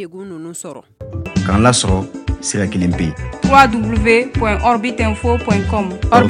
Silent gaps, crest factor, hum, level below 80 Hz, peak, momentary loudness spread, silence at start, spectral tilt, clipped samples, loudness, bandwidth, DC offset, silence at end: none; 16 dB; none; -28 dBFS; 0 dBFS; 17 LU; 0 s; -5 dB/octave; 0.3%; -15 LUFS; 12.5 kHz; under 0.1%; 0 s